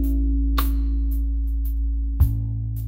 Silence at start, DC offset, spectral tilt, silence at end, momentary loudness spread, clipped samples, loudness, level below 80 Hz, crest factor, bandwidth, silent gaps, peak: 0 s; under 0.1%; -7.5 dB/octave; 0 s; 4 LU; under 0.1%; -24 LUFS; -22 dBFS; 14 dB; 16.5 kHz; none; -8 dBFS